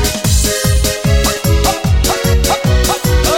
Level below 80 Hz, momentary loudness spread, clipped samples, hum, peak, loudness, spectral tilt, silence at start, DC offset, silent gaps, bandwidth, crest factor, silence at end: -16 dBFS; 1 LU; under 0.1%; none; 0 dBFS; -13 LUFS; -4 dB/octave; 0 s; under 0.1%; none; 17 kHz; 12 dB; 0 s